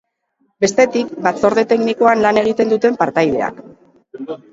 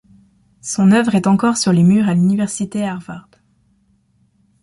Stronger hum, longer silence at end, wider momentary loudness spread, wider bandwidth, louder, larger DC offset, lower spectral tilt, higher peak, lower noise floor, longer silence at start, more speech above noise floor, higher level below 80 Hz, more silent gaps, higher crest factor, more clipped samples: neither; second, 0.15 s vs 1.4 s; second, 10 LU vs 17 LU; second, 8 kHz vs 11.5 kHz; about the same, -15 LUFS vs -15 LUFS; neither; second, -4.5 dB/octave vs -6 dB/octave; about the same, 0 dBFS vs -2 dBFS; first, -64 dBFS vs -59 dBFS; about the same, 0.6 s vs 0.65 s; first, 50 dB vs 44 dB; about the same, -54 dBFS vs -54 dBFS; neither; about the same, 16 dB vs 14 dB; neither